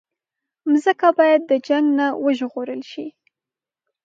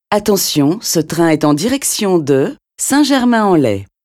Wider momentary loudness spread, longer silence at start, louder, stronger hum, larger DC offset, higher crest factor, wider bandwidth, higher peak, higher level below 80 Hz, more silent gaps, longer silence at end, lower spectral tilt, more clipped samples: first, 15 LU vs 4 LU; first, 0.65 s vs 0.1 s; second, -18 LUFS vs -13 LUFS; neither; neither; first, 18 dB vs 12 dB; second, 7.6 kHz vs 16.5 kHz; about the same, -2 dBFS vs 0 dBFS; second, -80 dBFS vs -50 dBFS; neither; first, 0.95 s vs 0.2 s; about the same, -4.5 dB/octave vs -4.5 dB/octave; neither